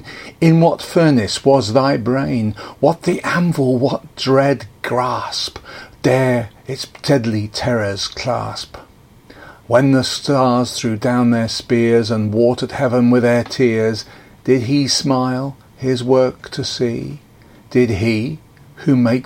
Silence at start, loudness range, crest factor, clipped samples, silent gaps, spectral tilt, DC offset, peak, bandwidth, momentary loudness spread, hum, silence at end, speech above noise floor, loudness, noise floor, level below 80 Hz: 0.05 s; 4 LU; 16 dB; under 0.1%; none; -6 dB/octave; under 0.1%; 0 dBFS; 16.5 kHz; 12 LU; none; 0 s; 28 dB; -16 LUFS; -44 dBFS; -48 dBFS